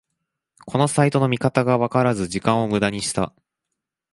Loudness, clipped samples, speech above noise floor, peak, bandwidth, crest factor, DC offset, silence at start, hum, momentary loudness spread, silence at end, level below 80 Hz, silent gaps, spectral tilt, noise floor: -21 LUFS; under 0.1%; 62 dB; -2 dBFS; 11.5 kHz; 20 dB; under 0.1%; 0.65 s; none; 6 LU; 0.85 s; -52 dBFS; none; -5.5 dB/octave; -82 dBFS